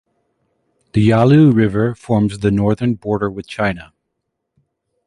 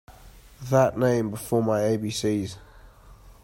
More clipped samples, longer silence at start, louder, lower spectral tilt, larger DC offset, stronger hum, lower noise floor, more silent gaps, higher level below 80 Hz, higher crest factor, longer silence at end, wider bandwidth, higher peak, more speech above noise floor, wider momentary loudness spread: neither; first, 0.95 s vs 0.1 s; first, -15 LUFS vs -24 LUFS; first, -8.5 dB/octave vs -6 dB/octave; neither; neither; first, -75 dBFS vs -49 dBFS; neither; first, -42 dBFS vs -52 dBFS; about the same, 16 dB vs 18 dB; first, 1.25 s vs 0.1 s; second, 11 kHz vs 16 kHz; first, -2 dBFS vs -8 dBFS; first, 61 dB vs 26 dB; about the same, 11 LU vs 13 LU